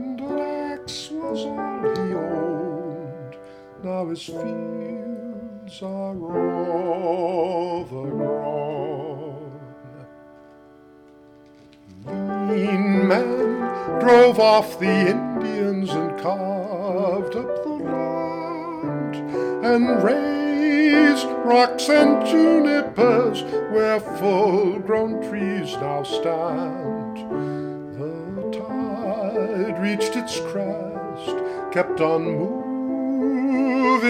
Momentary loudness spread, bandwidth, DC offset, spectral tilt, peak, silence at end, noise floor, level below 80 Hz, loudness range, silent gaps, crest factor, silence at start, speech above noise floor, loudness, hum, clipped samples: 14 LU; 15.5 kHz; under 0.1%; -6 dB/octave; -2 dBFS; 0 s; -49 dBFS; -60 dBFS; 12 LU; none; 20 dB; 0 s; 28 dB; -22 LUFS; none; under 0.1%